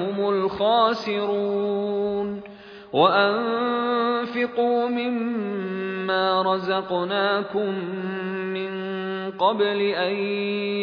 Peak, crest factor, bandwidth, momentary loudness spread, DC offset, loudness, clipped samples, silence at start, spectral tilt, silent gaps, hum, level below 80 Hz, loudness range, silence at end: -4 dBFS; 18 dB; 5.4 kHz; 8 LU; under 0.1%; -23 LUFS; under 0.1%; 0 s; -7 dB/octave; none; none; -66 dBFS; 3 LU; 0 s